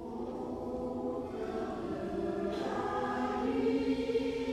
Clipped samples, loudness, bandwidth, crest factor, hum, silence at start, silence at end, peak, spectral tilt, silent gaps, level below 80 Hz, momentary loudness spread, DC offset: under 0.1%; -35 LUFS; 12 kHz; 14 dB; none; 0 s; 0 s; -22 dBFS; -6.5 dB/octave; none; -56 dBFS; 7 LU; under 0.1%